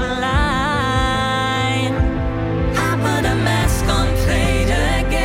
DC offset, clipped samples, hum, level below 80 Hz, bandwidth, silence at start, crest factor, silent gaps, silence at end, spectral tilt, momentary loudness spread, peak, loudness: 0.1%; under 0.1%; none; -24 dBFS; 16.5 kHz; 0 s; 12 dB; none; 0 s; -5 dB/octave; 2 LU; -6 dBFS; -18 LUFS